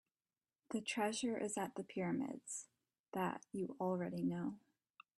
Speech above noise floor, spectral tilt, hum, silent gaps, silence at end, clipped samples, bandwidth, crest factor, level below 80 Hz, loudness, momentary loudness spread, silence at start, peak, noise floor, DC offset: over 48 dB; -4.5 dB/octave; none; 2.99-3.04 s; 0.6 s; under 0.1%; 12.5 kHz; 18 dB; -82 dBFS; -43 LUFS; 9 LU; 0.7 s; -26 dBFS; under -90 dBFS; under 0.1%